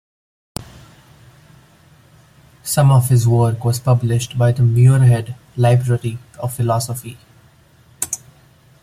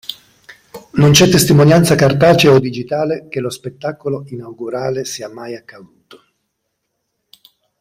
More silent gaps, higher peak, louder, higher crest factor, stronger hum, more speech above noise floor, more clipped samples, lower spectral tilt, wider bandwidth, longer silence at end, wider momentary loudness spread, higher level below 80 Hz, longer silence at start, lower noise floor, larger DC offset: neither; about the same, -2 dBFS vs 0 dBFS; second, -16 LUFS vs -13 LUFS; about the same, 16 dB vs 16 dB; neither; second, 35 dB vs 59 dB; neither; first, -6.5 dB/octave vs -5 dB/octave; about the same, 15.5 kHz vs 16 kHz; second, 0.65 s vs 2.2 s; about the same, 18 LU vs 19 LU; about the same, -48 dBFS vs -46 dBFS; first, 0.6 s vs 0.1 s; second, -50 dBFS vs -72 dBFS; neither